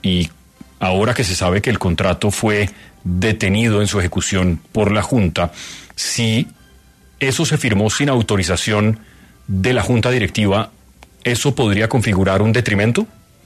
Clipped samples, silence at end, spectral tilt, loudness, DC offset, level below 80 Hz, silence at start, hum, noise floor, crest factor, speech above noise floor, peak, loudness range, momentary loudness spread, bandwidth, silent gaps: under 0.1%; 0.4 s; -5 dB/octave; -17 LUFS; under 0.1%; -38 dBFS; 0.05 s; none; -48 dBFS; 14 dB; 31 dB; -2 dBFS; 2 LU; 8 LU; 13.5 kHz; none